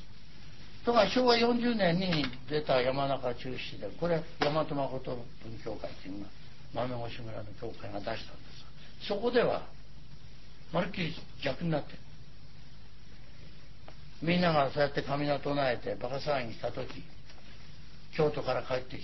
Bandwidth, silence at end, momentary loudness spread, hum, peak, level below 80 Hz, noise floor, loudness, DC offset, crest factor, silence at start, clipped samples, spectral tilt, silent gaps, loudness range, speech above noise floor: 6 kHz; 0 s; 25 LU; none; -10 dBFS; -54 dBFS; -53 dBFS; -32 LUFS; 1%; 22 dB; 0 s; under 0.1%; -6.5 dB/octave; none; 11 LU; 21 dB